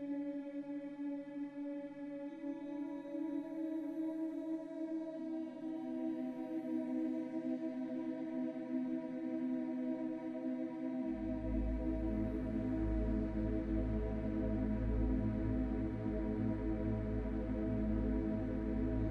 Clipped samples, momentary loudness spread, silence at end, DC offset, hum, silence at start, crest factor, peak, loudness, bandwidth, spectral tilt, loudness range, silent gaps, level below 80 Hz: under 0.1%; 7 LU; 0 s; under 0.1%; none; 0 s; 14 dB; -26 dBFS; -40 LUFS; 5 kHz; -10 dB/octave; 5 LU; none; -46 dBFS